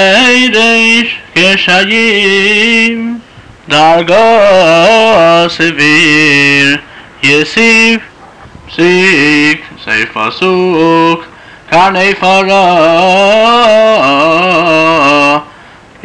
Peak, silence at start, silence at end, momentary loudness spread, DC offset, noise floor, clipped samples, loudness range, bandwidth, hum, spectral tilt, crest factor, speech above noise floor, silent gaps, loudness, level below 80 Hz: 0 dBFS; 0 s; 0.55 s; 7 LU; 1%; -35 dBFS; under 0.1%; 3 LU; 11 kHz; none; -4 dB/octave; 6 dB; 29 dB; none; -6 LUFS; -44 dBFS